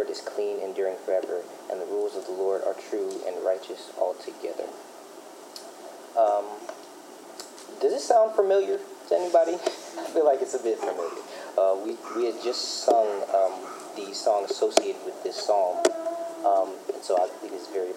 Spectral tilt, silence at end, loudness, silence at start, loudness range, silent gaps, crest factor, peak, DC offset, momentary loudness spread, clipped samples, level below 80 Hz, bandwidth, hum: -2 dB/octave; 0 s; -27 LUFS; 0 s; 7 LU; none; 26 dB; -2 dBFS; under 0.1%; 18 LU; under 0.1%; under -90 dBFS; 16 kHz; none